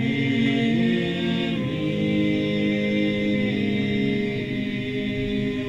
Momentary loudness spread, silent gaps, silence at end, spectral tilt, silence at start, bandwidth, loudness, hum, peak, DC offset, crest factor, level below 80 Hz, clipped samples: 5 LU; none; 0 s; -7 dB/octave; 0 s; 8.2 kHz; -23 LUFS; none; -10 dBFS; under 0.1%; 12 dB; -48 dBFS; under 0.1%